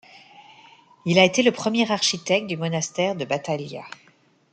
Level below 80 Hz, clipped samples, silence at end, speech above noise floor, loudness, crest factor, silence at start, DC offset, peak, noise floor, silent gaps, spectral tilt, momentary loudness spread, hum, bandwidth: -68 dBFS; under 0.1%; 0.65 s; 29 dB; -22 LUFS; 22 dB; 0.15 s; under 0.1%; -2 dBFS; -52 dBFS; none; -4 dB/octave; 15 LU; none; 9.4 kHz